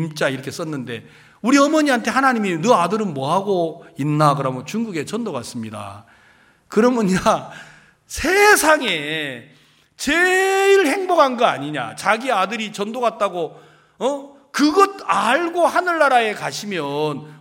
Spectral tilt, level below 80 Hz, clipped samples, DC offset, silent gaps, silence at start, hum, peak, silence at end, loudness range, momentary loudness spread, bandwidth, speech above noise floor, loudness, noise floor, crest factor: -4 dB/octave; -52 dBFS; under 0.1%; under 0.1%; none; 0 s; none; -2 dBFS; 0.05 s; 5 LU; 13 LU; 17 kHz; 35 dB; -18 LUFS; -53 dBFS; 18 dB